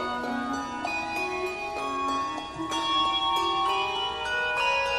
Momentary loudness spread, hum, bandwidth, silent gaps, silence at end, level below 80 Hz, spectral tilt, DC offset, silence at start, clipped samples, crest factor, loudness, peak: 7 LU; none; 15 kHz; none; 0 s; -54 dBFS; -2.5 dB/octave; under 0.1%; 0 s; under 0.1%; 14 dB; -27 LUFS; -14 dBFS